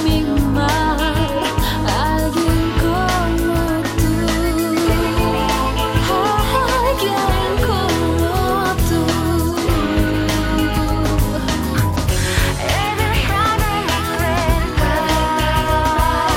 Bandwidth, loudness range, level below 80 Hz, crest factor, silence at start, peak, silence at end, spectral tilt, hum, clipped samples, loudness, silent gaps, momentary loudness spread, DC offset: 17 kHz; 1 LU; -24 dBFS; 12 dB; 0 s; -4 dBFS; 0 s; -5 dB/octave; none; under 0.1%; -17 LUFS; none; 2 LU; under 0.1%